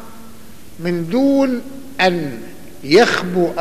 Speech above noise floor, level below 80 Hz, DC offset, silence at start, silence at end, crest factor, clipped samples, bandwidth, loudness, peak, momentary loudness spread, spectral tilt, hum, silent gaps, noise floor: 25 dB; -50 dBFS; 2%; 0 s; 0 s; 16 dB; under 0.1%; 15 kHz; -16 LUFS; -2 dBFS; 20 LU; -5.5 dB/octave; none; none; -41 dBFS